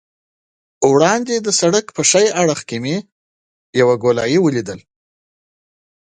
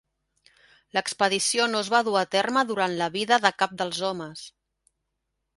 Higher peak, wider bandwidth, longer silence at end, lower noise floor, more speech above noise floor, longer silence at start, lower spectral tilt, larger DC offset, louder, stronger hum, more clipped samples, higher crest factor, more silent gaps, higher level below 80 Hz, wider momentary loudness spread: about the same, 0 dBFS vs -2 dBFS; about the same, 11 kHz vs 11.5 kHz; first, 1.3 s vs 1.1 s; first, under -90 dBFS vs -80 dBFS; first, over 75 dB vs 55 dB; second, 0.8 s vs 0.95 s; about the same, -3.5 dB/octave vs -2.5 dB/octave; neither; first, -15 LUFS vs -24 LUFS; neither; neither; second, 18 dB vs 24 dB; first, 3.12-3.73 s vs none; first, -58 dBFS vs -70 dBFS; about the same, 11 LU vs 10 LU